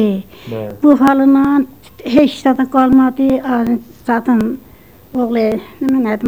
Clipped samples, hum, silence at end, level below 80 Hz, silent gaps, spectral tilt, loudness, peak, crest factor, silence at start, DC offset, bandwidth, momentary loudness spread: under 0.1%; none; 0 s; -44 dBFS; none; -7 dB/octave; -13 LUFS; 0 dBFS; 14 dB; 0 s; 0.3%; 15 kHz; 15 LU